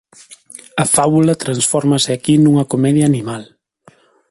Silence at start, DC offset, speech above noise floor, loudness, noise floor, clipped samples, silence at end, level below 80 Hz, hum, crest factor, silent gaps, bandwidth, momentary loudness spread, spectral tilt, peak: 0.3 s; under 0.1%; 36 dB; -14 LUFS; -50 dBFS; under 0.1%; 0.85 s; -52 dBFS; none; 16 dB; none; 12 kHz; 15 LU; -5 dB/octave; 0 dBFS